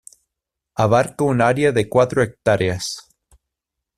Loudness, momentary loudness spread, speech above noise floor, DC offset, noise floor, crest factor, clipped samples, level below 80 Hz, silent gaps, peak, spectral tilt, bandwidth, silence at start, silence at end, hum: -18 LUFS; 11 LU; 66 dB; under 0.1%; -83 dBFS; 18 dB; under 0.1%; -50 dBFS; none; -2 dBFS; -5.5 dB/octave; 14.5 kHz; 0.8 s; 0.95 s; none